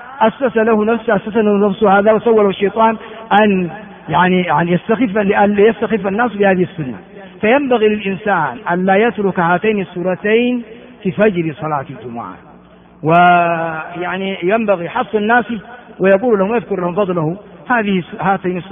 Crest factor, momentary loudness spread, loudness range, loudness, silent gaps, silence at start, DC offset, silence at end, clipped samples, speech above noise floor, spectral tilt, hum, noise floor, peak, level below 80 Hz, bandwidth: 14 dB; 11 LU; 3 LU; -14 LUFS; none; 0 s; under 0.1%; 0 s; under 0.1%; 28 dB; -5 dB/octave; none; -42 dBFS; 0 dBFS; -52 dBFS; 3.7 kHz